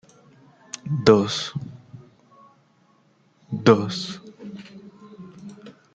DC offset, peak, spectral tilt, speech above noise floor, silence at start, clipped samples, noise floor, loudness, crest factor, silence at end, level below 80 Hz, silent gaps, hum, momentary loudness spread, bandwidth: under 0.1%; -2 dBFS; -5.5 dB/octave; 41 dB; 0.75 s; under 0.1%; -61 dBFS; -21 LUFS; 24 dB; 0.25 s; -60 dBFS; none; none; 27 LU; 9 kHz